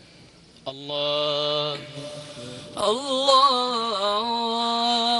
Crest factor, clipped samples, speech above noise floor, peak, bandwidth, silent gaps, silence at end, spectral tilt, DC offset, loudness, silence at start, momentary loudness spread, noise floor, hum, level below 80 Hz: 20 dB; under 0.1%; 28 dB; -6 dBFS; 11.5 kHz; none; 0 s; -3 dB/octave; under 0.1%; -22 LUFS; 0.2 s; 19 LU; -50 dBFS; none; -64 dBFS